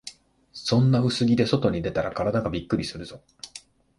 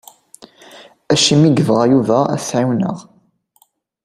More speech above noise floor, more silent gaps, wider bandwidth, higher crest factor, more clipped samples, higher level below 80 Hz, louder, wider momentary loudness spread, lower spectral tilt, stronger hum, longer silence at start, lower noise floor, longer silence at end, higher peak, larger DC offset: second, 25 dB vs 44 dB; neither; second, 11.5 kHz vs 15 kHz; about the same, 18 dB vs 16 dB; neither; first, -48 dBFS vs -54 dBFS; second, -24 LUFS vs -14 LUFS; first, 21 LU vs 9 LU; first, -6.5 dB/octave vs -5 dB/octave; neither; second, 0.05 s vs 0.75 s; second, -49 dBFS vs -58 dBFS; second, 0.4 s vs 1.05 s; second, -8 dBFS vs 0 dBFS; neither